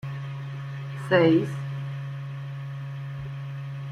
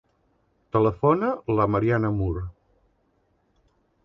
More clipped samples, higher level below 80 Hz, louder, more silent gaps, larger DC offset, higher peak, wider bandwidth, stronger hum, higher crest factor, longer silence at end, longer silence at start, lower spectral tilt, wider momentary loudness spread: neither; second, -60 dBFS vs -44 dBFS; second, -28 LUFS vs -24 LUFS; neither; neither; about the same, -8 dBFS vs -8 dBFS; first, 10 kHz vs 5.8 kHz; neither; about the same, 20 dB vs 18 dB; second, 0 s vs 1.55 s; second, 0.05 s vs 0.75 s; second, -8 dB/octave vs -10.5 dB/octave; first, 15 LU vs 8 LU